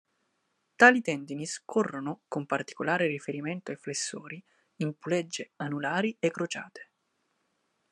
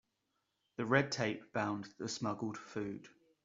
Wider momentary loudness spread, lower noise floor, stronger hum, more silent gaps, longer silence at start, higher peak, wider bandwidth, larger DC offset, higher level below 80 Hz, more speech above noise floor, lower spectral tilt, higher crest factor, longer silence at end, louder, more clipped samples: first, 17 LU vs 12 LU; second, -77 dBFS vs -84 dBFS; neither; neither; about the same, 0.8 s vs 0.8 s; first, -4 dBFS vs -14 dBFS; first, 12 kHz vs 7.8 kHz; neither; second, -82 dBFS vs -76 dBFS; about the same, 47 dB vs 46 dB; about the same, -4.5 dB/octave vs -4.5 dB/octave; about the same, 28 dB vs 26 dB; first, 1.1 s vs 0.35 s; first, -29 LUFS vs -38 LUFS; neither